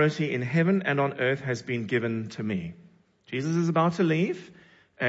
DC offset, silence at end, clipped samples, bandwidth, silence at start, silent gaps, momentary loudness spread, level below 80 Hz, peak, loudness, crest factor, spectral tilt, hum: under 0.1%; 0 s; under 0.1%; 8 kHz; 0 s; none; 9 LU; -68 dBFS; -12 dBFS; -27 LUFS; 16 dB; -7 dB/octave; none